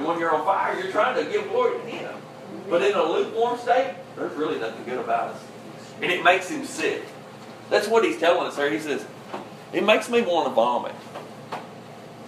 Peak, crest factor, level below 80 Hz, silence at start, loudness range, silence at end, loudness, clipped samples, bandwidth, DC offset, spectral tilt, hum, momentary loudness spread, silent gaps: -2 dBFS; 22 dB; -74 dBFS; 0 s; 3 LU; 0 s; -23 LUFS; under 0.1%; 15 kHz; under 0.1%; -4 dB/octave; none; 19 LU; none